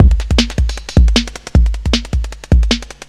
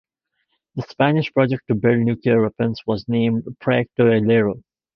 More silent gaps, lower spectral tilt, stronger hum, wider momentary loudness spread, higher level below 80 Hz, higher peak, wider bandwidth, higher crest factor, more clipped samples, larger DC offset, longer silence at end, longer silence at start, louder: neither; second, -5 dB/octave vs -9.5 dB/octave; neither; about the same, 6 LU vs 8 LU; first, -14 dBFS vs -54 dBFS; about the same, 0 dBFS vs -2 dBFS; first, 10.5 kHz vs 6 kHz; second, 12 dB vs 18 dB; neither; neither; second, 0.2 s vs 0.35 s; second, 0 s vs 0.75 s; first, -15 LUFS vs -19 LUFS